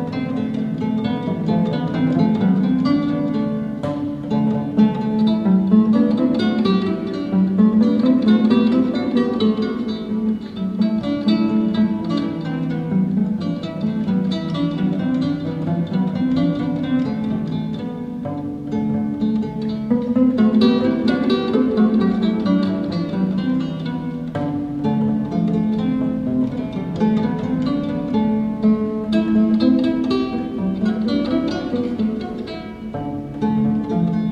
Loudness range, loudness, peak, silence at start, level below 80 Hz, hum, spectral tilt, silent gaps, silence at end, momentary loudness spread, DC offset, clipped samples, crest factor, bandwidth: 5 LU; -19 LUFS; -2 dBFS; 0 s; -48 dBFS; none; -9 dB/octave; none; 0 s; 9 LU; under 0.1%; under 0.1%; 16 dB; 6.6 kHz